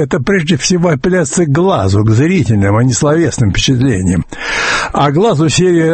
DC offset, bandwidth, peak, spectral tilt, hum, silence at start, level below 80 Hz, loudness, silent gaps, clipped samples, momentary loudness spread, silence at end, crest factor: under 0.1%; 8.8 kHz; 0 dBFS; -5.5 dB/octave; none; 0 s; -32 dBFS; -11 LUFS; none; under 0.1%; 3 LU; 0 s; 10 dB